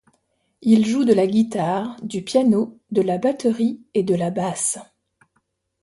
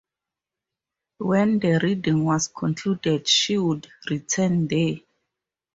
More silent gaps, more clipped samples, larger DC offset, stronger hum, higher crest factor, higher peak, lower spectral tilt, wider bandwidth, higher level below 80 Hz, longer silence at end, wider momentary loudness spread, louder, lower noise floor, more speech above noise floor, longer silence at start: neither; neither; neither; neither; about the same, 18 dB vs 18 dB; about the same, -4 dBFS vs -6 dBFS; about the same, -5.5 dB/octave vs -4.5 dB/octave; first, 11.5 kHz vs 8 kHz; about the same, -64 dBFS vs -60 dBFS; first, 1 s vs 0.75 s; second, 8 LU vs 11 LU; about the same, -20 LUFS vs -22 LUFS; second, -70 dBFS vs -88 dBFS; second, 50 dB vs 66 dB; second, 0.6 s vs 1.2 s